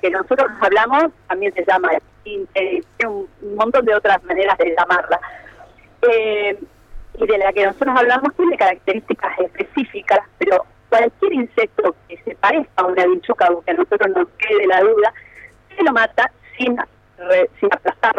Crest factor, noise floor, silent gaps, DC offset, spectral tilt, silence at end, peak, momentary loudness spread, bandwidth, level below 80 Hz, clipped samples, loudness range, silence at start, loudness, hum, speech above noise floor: 12 dB; -45 dBFS; none; under 0.1%; -5 dB/octave; 0 s; -4 dBFS; 8 LU; 8.6 kHz; -50 dBFS; under 0.1%; 2 LU; 0.05 s; -17 LUFS; none; 28 dB